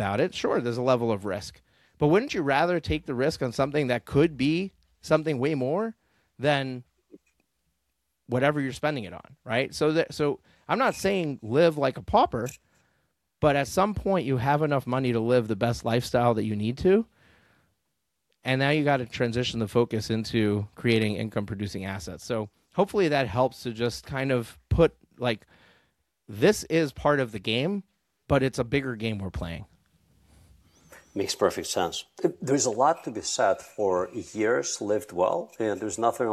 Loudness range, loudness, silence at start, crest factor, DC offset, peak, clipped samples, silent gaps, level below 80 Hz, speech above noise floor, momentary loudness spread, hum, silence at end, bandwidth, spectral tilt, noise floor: 5 LU; -26 LUFS; 0 s; 20 dB; under 0.1%; -8 dBFS; under 0.1%; none; -50 dBFS; 54 dB; 9 LU; none; 0 s; 14.5 kHz; -5.5 dB/octave; -80 dBFS